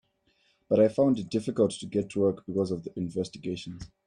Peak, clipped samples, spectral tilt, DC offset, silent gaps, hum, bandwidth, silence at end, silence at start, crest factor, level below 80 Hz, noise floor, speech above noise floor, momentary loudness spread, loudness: -10 dBFS; under 0.1%; -7 dB/octave; under 0.1%; none; none; 10.5 kHz; 0.2 s; 0.7 s; 18 dB; -62 dBFS; -70 dBFS; 42 dB; 12 LU; -28 LUFS